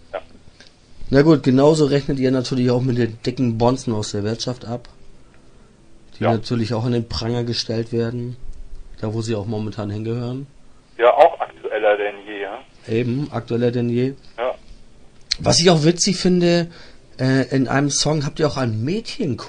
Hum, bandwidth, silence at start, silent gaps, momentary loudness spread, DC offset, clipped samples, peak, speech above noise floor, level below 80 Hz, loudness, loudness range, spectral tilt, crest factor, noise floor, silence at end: none; 10.5 kHz; 0.1 s; none; 15 LU; under 0.1%; under 0.1%; 0 dBFS; 28 dB; -42 dBFS; -19 LUFS; 7 LU; -5.5 dB/octave; 20 dB; -47 dBFS; 0 s